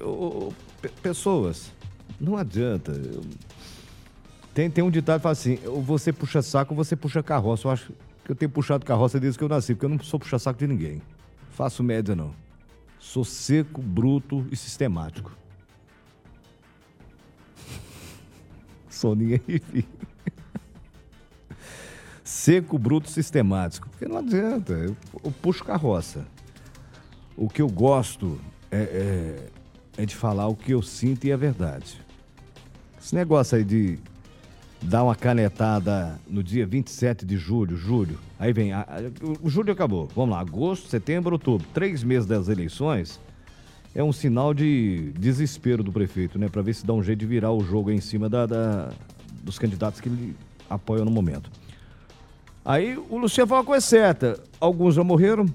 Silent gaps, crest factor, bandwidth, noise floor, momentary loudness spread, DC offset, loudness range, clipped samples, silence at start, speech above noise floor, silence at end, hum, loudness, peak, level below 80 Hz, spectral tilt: none; 22 dB; 15 kHz; -55 dBFS; 17 LU; under 0.1%; 5 LU; under 0.1%; 0 s; 32 dB; 0 s; none; -25 LUFS; -4 dBFS; -50 dBFS; -7 dB/octave